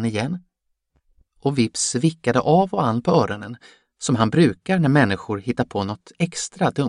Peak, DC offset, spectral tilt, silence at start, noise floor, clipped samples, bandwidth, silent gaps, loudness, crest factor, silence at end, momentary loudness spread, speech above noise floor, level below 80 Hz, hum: -2 dBFS; under 0.1%; -5.5 dB/octave; 0 s; -70 dBFS; under 0.1%; 11 kHz; none; -21 LUFS; 20 dB; 0 s; 11 LU; 49 dB; -56 dBFS; none